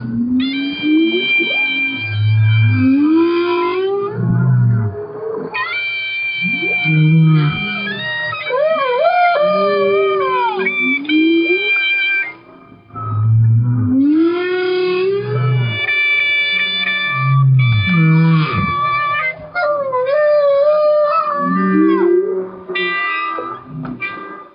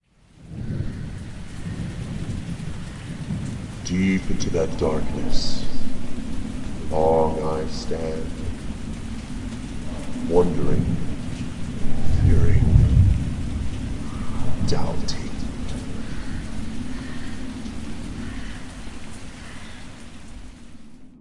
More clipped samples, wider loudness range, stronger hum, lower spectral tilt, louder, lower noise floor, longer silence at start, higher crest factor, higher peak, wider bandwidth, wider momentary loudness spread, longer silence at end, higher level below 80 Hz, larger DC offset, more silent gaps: neither; second, 2 LU vs 12 LU; neither; first, -11.5 dB/octave vs -6.5 dB/octave; first, -15 LUFS vs -26 LUFS; second, -41 dBFS vs -48 dBFS; second, 0 s vs 0.4 s; second, 12 dB vs 20 dB; about the same, -2 dBFS vs 0 dBFS; second, 5.4 kHz vs 11 kHz; second, 7 LU vs 18 LU; about the same, 0.1 s vs 0.1 s; second, -50 dBFS vs -30 dBFS; neither; neither